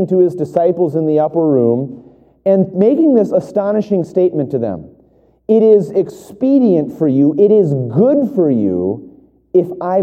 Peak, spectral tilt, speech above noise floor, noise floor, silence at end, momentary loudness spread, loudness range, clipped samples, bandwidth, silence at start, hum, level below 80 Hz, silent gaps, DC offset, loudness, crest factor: 0 dBFS; -10.5 dB/octave; 38 dB; -51 dBFS; 0 s; 9 LU; 2 LU; under 0.1%; 8.6 kHz; 0 s; none; -58 dBFS; none; under 0.1%; -14 LUFS; 14 dB